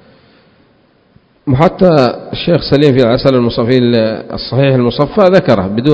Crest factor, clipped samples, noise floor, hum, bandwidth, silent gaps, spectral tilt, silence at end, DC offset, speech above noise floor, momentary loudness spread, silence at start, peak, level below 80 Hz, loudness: 12 dB; 0.8%; -50 dBFS; none; 8 kHz; none; -8.5 dB/octave; 0 s; under 0.1%; 40 dB; 8 LU; 1.45 s; 0 dBFS; -38 dBFS; -11 LUFS